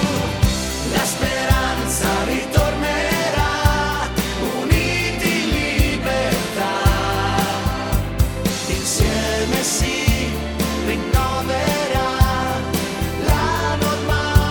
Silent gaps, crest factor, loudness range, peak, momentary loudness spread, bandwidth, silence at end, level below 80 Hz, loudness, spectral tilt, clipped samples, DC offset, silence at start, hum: none; 18 dB; 1 LU; 0 dBFS; 4 LU; over 20 kHz; 0 s; -26 dBFS; -19 LUFS; -4.5 dB/octave; under 0.1%; under 0.1%; 0 s; none